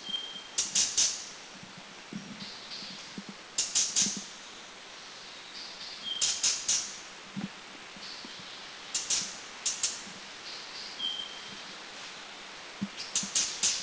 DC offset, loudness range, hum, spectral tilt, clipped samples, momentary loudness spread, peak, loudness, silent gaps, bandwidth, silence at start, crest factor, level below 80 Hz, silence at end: under 0.1%; 4 LU; none; 0.5 dB/octave; under 0.1%; 18 LU; -12 dBFS; -31 LUFS; none; 8 kHz; 0 s; 24 dB; -70 dBFS; 0 s